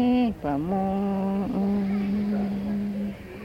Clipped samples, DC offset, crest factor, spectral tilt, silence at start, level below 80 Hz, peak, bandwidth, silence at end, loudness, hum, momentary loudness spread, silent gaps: under 0.1%; under 0.1%; 12 dB; -9 dB/octave; 0 s; -48 dBFS; -14 dBFS; 5.8 kHz; 0 s; -27 LUFS; none; 4 LU; none